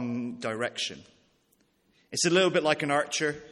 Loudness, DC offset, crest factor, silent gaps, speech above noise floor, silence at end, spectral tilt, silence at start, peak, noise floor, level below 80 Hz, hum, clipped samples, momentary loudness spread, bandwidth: -27 LUFS; under 0.1%; 20 dB; none; 41 dB; 0 s; -3.5 dB/octave; 0 s; -8 dBFS; -69 dBFS; -70 dBFS; none; under 0.1%; 11 LU; 12.5 kHz